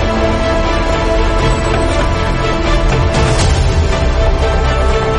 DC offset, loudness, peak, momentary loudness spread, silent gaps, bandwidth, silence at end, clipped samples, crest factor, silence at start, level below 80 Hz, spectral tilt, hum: under 0.1%; -14 LUFS; -2 dBFS; 2 LU; none; 11 kHz; 0 s; under 0.1%; 10 dB; 0 s; -16 dBFS; -5.5 dB/octave; none